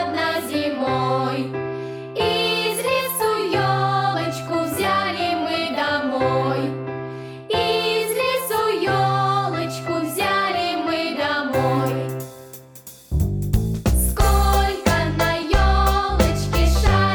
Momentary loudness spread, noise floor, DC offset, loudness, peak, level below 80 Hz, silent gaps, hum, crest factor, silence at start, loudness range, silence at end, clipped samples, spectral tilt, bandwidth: 9 LU; -43 dBFS; under 0.1%; -21 LUFS; -6 dBFS; -28 dBFS; none; none; 14 dB; 0 s; 3 LU; 0 s; under 0.1%; -5 dB/octave; over 20 kHz